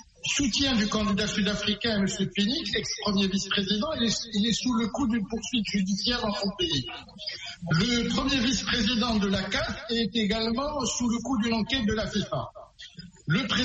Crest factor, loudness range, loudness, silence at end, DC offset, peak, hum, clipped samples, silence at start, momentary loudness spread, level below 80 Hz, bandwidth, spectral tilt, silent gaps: 16 dB; 2 LU; -27 LUFS; 0 s; under 0.1%; -12 dBFS; none; under 0.1%; 0.25 s; 8 LU; -46 dBFS; 8.4 kHz; -4 dB/octave; none